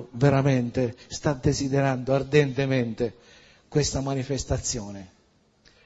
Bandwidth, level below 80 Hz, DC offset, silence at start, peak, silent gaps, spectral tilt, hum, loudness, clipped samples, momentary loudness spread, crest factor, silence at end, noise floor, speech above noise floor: 8 kHz; -44 dBFS; under 0.1%; 0 s; -6 dBFS; none; -5.5 dB/octave; none; -25 LUFS; under 0.1%; 9 LU; 20 dB; 0.8 s; -63 dBFS; 38 dB